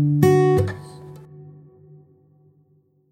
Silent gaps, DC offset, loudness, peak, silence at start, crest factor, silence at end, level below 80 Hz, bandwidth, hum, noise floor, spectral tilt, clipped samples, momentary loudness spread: none; under 0.1%; -18 LUFS; -2 dBFS; 0 s; 20 dB; 1.7 s; -52 dBFS; 15.5 kHz; none; -60 dBFS; -8 dB/octave; under 0.1%; 26 LU